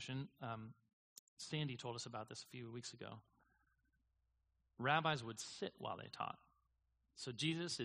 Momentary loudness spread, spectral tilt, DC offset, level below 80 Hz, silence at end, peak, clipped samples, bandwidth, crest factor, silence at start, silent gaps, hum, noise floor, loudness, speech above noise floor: 20 LU; -4 dB/octave; under 0.1%; -82 dBFS; 0 s; -20 dBFS; under 0.1%; 11 kHz; 26 dB; 0 s; 0.93-1.37 s; none; -83 dBFS; -45 LUFS; 38 dB